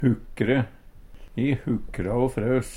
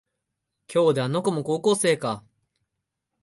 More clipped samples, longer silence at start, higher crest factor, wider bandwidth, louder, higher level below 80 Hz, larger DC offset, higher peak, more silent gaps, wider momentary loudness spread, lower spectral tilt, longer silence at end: neither; second, 0 s vs 0.7 s; about the same, 18 dB vs 16 dB; about the same, 13 kHz vs 12 kHz; second, -26 LUFS vs -23 LUFS; first, -42 dBFS vs -70 dBFS; neither; about the same, -8 dBFS vs -10 dBFS; neither; about the same, 5 LU vs 7 LU; first, -7.5 dB/octave vs -5 dB/octave; second, 0 s vs 1.05 s